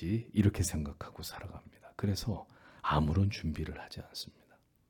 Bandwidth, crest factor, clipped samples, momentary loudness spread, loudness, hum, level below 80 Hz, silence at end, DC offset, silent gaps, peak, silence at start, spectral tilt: 18 kHz; 20 dB; under 0.1%; 18 LU; -35 LUFS; none; -50 dBFS; 0.6 s; under 0.1%; none; -14 dBFS; 0 s; -6 dB/octave